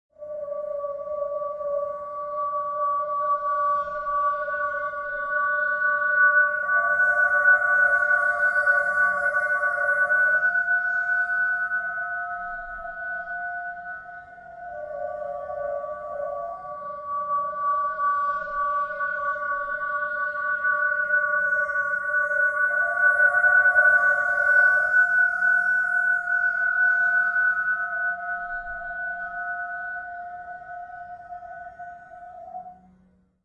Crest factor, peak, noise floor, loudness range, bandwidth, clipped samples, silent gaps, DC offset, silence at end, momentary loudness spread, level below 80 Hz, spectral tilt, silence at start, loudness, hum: 16 dB; -8 dBFS; -61 dBFS; 14 LU; 11.5 kHz; under 0.1%; none; under 0.1%; 0.7 s; 19 LU; -60 dBFS; -3.5 dB/octave; 0.2 s; -22 LUFS; none